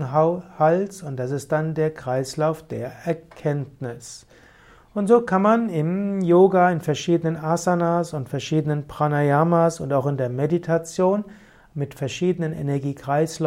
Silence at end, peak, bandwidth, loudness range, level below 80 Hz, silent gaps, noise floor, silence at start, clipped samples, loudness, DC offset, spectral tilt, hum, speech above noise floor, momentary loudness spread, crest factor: 0 s; -4 dBFS; 14.5 kHz; 6 LU; -58 dBFS; none; -51 dBFS; 0 s; under 0.1%; -22 LUFS; under 0.1%; -7 dB/octave; none; 30 dB; 12 LU; 18 dB